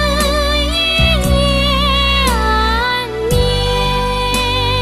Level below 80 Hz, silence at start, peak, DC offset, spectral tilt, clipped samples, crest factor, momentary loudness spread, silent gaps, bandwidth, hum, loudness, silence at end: -20 dBFS; 0 s; -2 dBFS; 0.2%; -4 dB/octave; under 0.1%; 12 dB; 4 LU; none; 14 kHz; none; -14 LUFS; 0 s